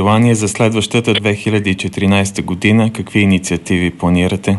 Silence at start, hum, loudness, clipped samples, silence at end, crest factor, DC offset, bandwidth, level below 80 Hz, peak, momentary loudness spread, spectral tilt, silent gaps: 0 s; none; -14 LUFS; under 0.1%; 0 s; 14 dB; under 0.1%; 12 kHz; -42 dBFS; 0 dBFS; 4 LU; -5.5 dB/octave; none